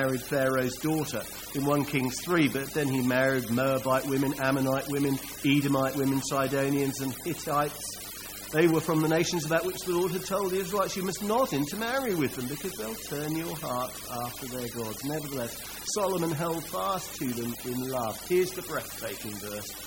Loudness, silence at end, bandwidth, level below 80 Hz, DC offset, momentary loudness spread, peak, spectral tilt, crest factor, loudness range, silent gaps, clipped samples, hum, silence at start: -29 LUFS; 0 s; 17 kHz; -56 dBFS; under 0.1%; 9 LU; -10 dBFS; -4.5 dB/octave; 18 dB; 5 LU; none; under 0.1%; 50 Hz at -55 dBFS; 0 s